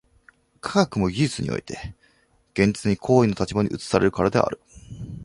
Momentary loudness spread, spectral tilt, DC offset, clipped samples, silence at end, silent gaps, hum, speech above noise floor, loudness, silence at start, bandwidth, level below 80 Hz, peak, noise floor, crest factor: 18 LU; -6 dB/octave; under 0.1%; under 0.1%; 0 s; none; none; 40 dB; -22 LUFS; 0.65 s; 11.5 kHz; -46 dBFS; -2 dBFS; -62 dBFS; 22 dB